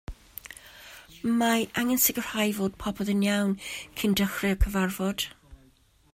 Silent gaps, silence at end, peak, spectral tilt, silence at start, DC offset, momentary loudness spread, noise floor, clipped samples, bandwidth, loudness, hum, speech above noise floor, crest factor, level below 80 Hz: none; 0.6 s; -8 dBFS; -4 dB/octave; 0.1 s; under 0.1%; 20 LU; -61 dBFS; under 0.1%; 16 kHz; -27 LUFS; none; 35 dB; 20 dB; -40 dBFS